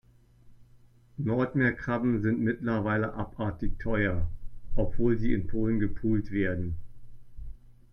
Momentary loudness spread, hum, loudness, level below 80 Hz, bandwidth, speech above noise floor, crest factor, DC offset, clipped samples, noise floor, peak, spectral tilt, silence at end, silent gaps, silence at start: 14 LU; none; -30 LUFS; -38 dBFS; 5.6 kHz; 30 dB; 16 dB; under 0.1%; under 0.1%; -57 dBFS; -12 dBFS; -10 dB/octave; 0.2 s; none; 0.45 s